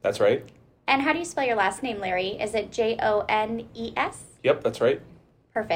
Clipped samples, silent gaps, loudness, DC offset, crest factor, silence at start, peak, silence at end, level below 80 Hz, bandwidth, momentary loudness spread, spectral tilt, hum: under 0.1%; none; -26 LUFS; under 0.1%; 20 dB; 0.05 s; -6 dBFS; 0 s; -58 dBFS; 16 kHz; 9 LU; -4 dB/octave; none